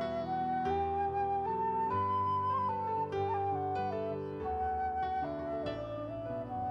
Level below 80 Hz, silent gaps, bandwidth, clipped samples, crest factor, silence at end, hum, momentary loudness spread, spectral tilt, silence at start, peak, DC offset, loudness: -56 dBFS; none; 6.6 kHz; under 0.1%; 12 dB; 0 s; none; 7 LU; -8 dB/octave; 0 s; -22 dBFS; under 0.1%; -34 LUFS